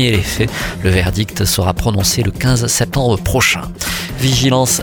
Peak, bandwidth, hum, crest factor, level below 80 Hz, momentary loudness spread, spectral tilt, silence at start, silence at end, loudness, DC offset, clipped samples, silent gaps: 0 dBFS; 19 kHz; none; 14 dB; -28 dBFS; 6 LU; -4 dB/octave; 0 s; 0 s; -15 LUFS; under 0.1%; under 0.1%; none